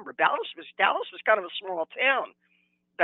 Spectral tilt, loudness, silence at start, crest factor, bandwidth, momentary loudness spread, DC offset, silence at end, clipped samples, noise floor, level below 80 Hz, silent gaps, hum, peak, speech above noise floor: -5 dB/octave; -26 LUFS; 0 s; 22 dB; 4.2 kHz; 9 LU; under 0.1%; 0 s; under 0.1%; -70 dBFS; -86 dBFS; none; none; -6 dBFS; 43 dB